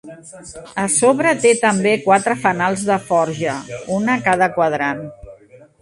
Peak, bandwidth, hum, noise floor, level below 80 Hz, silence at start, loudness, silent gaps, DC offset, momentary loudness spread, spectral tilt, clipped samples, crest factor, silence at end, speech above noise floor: 0 dBFS; 11.5 kHz; none; -45 dBFS; -54 dBFS; 0.05 s; -17 LUFS; none; under 0.1%; 15 LU; -4 dB/octave; under 0.1%; 18 dB; 0.45 s; 28 dB